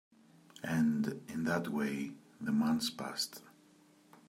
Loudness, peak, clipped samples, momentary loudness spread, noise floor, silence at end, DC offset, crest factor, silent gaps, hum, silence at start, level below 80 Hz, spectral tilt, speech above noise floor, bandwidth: -36 LUFS; -20 dBFS; under 0.1%; 12 LU; -64 dBFS; 0.8 s; under 0.1%; 18 dB; none; none; 0.55 s; -74 dBFS; -5 dB/octave; 30 dB; 16 kHz